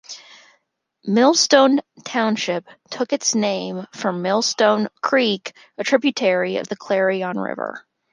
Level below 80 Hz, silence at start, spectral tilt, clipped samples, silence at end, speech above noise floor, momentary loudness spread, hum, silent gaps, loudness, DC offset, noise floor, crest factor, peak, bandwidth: -72 dBFS; 0.1 s; -3.5 dB/octave; under 0.1%; 0.35 s; 46 dB; 15 LU; none; none; -19 LUFS; under 0.1%; -66 dBFS; 18 dB; -2 dBFS; 10.5 kHz